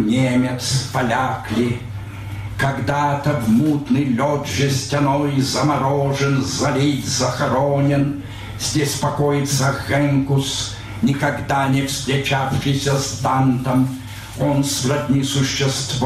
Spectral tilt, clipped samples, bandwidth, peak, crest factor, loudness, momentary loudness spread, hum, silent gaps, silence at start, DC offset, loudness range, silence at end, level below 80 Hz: -5 dB/octave; under 0.1%; 15 kHz; -8 dBFS; 10 dB; -19 LUFS; 6 LU; none; none; 0 s; under 0.1%; 2 LU; 0 s; -42 dBFS